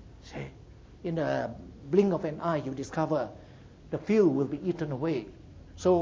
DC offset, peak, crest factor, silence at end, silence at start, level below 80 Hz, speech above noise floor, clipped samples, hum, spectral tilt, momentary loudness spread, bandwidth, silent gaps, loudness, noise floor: under 0.1%; -10 dBFS; 18 dB; 0 s; 0 s; -54 dBFS; 22 dB; under 0.1%; none; -7.5 dB/octave; 19 LU; 7.8 kHz; none; -30 LUFS; -51 dBFS